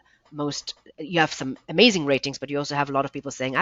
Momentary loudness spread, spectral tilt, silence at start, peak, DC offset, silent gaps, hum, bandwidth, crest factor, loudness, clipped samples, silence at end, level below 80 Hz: 15 LU; -4 dB/octave; 0.3 s; -2 dBFS; under 0.1%; none; none; 7.8 kHz; 22 dB; -24 LUFS; under 0.1%; 0 s; -62 dBFS